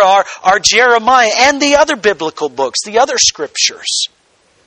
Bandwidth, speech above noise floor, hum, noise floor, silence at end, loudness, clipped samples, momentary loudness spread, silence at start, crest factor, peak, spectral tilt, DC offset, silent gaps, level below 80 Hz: 13 kHz; 41 dB; none; -53 dBFS; 0.6 s; -11 LUFS; 0.2%; 8 LU; 0 s; 12 dB; 0 dBFS; -0.5 dB/octave; under 0.1%; none; -48 dBFS